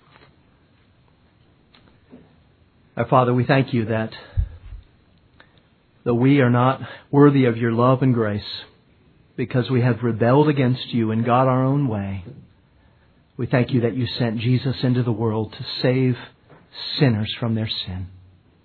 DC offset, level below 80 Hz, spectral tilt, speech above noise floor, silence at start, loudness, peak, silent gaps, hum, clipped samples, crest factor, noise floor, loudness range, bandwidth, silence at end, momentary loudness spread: under 0.1%; -44 dBFS; -10.5 dB/octave; 38 dB; 2.15 s; -20 LUFS; -2 dBFS; none; none; under 0.1%; 20 dB; -57 dBFS; 5 LU; 4.6 kHz; 0.55 s; 14 LU